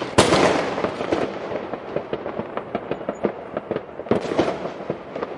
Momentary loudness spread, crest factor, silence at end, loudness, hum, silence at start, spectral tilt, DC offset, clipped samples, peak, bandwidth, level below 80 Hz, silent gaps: 13 LU; 22 dB; 0 s; -24 LUFS; none; 0 s; -4.5 dB/octave; under 0.1%; under 0.1%; 0 dBFS; 11.5 kHz; -52 dBFS; none